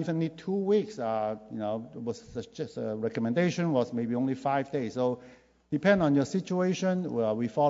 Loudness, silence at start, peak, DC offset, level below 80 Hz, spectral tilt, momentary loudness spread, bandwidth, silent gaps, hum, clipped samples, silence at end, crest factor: -30 LUFS; 0 s; -10 dBFS; under 0.1%; -66 dBFS; -7 dB/octave; 11 LU; 7.8 kHz; none; none; under 0.1%; 0 s; 18 dB